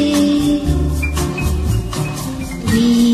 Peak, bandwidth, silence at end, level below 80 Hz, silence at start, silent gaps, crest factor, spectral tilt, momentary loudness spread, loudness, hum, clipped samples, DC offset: -2 dBFS; 14 kHz; 0 s; -24 dBFS; 0 s; none; 12 dB; -5.5 dB/octave; 9 LU; -17 LUFS; none; under 0.1%; under 0.1%